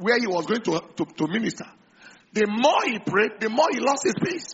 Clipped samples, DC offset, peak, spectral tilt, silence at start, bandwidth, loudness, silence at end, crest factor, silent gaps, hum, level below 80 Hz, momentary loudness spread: under 0.1%; under 0.1%; -6 dBFS; -3 dB/octave; 0 s; 8 kHz; -23 LUFS; 0 s; 18 dB; none; none; -68 dBFS; 10 LU